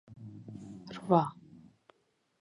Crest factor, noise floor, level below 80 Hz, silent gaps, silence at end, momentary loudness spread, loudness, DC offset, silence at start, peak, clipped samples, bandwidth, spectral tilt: 26 dB; -75 dBFS; -74 dBFS; none; 1.1 s; 20 LU; -30 LUFS; under 0.1%; 0.1 s; -10 dBFS; under 0.1%; 11 kHz; -8.5 dB/octave